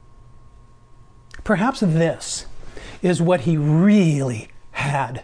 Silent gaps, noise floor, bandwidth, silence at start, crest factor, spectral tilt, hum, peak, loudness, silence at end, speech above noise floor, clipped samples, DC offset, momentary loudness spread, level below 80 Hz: none; -46 dBFS; 10.5 kHz; 0.1 s; 14 dB; -6.5 dB/octave; none; -6 dBFS; -19 LUFS; 0 s; 28 dB; under 0.1%; under 0.1%; 18 LU; -44 dBFS